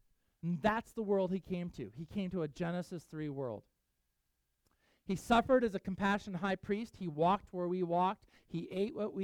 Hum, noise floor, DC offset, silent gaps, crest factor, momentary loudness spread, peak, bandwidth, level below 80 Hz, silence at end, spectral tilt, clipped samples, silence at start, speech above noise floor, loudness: none; -82 dBFS; under 0.1%; none; 20 dB; 13 LU; -16 dBFS; 15.5 kHz; -62 dBFS; 0 s; -7 dB/octave; under 0.1%; 0.45 s; 47 dB; -36 LUFS